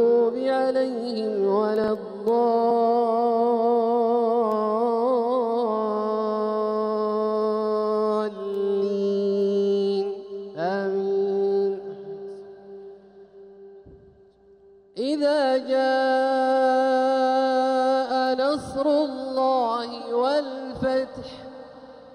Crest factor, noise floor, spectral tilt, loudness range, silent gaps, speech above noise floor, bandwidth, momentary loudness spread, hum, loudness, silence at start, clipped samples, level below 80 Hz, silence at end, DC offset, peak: 12 dB; -54 dBFS; -6 dB/octave; 7 LU; none; 31 dB; 10.5 kHz; 13 LU; none; -23 LUFS; 0 s; under 0.1%; -64 dBFS; 0 s; under 0.1%; -10 dBFS